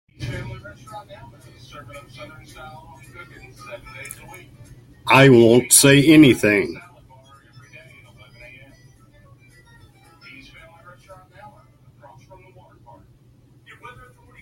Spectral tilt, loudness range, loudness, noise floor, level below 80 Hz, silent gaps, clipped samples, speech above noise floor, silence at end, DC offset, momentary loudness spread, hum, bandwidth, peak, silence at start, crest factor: -4 dB/octave; 25 LU; -13 LUFS; -52 dBFS; -52 dBFS; none; under 0.1%; 35 dB; 7.65 s; under 0.1%; 29 LU; none; 16.5 kHz; 0 dBFS; 0.2 s; 22 dB